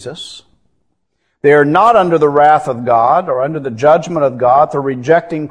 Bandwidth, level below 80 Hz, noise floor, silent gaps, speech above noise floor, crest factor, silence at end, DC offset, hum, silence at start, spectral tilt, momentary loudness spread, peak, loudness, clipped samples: 10.5 kHz; -52 dBFS; -67 dBFS; none; 55 dB; 12 dB; 0 s; under 0.1%; none; 0 s; -6.5 dB/octave; 9 LU; 0 dBFS; -11 LUFS; 0.1%